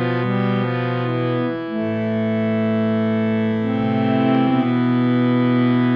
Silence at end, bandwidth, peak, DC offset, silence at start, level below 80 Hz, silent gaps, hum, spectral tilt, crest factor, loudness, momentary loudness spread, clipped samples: 0 s; 5.4 kHz; -6 dBFS; under 0.1%; 0 s; -60 dBFS; none; none; -10 dB/octave; 12 dB; -19 LUFS; 5 LU; under 0.1%